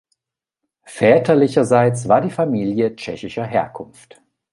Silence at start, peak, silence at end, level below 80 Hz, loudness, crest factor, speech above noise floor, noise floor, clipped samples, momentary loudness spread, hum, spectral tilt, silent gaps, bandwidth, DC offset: 0.9 s; -2 dBFS; 0.7 s; -56 dBFS; -17 LUFS; 18 dB; 67 dB; -83 dBFS; under 0.1%; 16 LU; none; -6.5 dB/octave; none; 11.5 kHz; under 0.1%